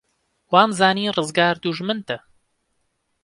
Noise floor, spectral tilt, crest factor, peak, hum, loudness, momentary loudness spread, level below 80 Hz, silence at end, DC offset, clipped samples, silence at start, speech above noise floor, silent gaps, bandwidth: -71 dBFS; -4.5 dB/octave; 22 dB; 0 dBFS; none; -19 LUFS; 11 LU; -66 dBFS; 1.05 s; under 0.1%; under 0.1%; 0.5 s; 52 dB; none; 11.5 kHz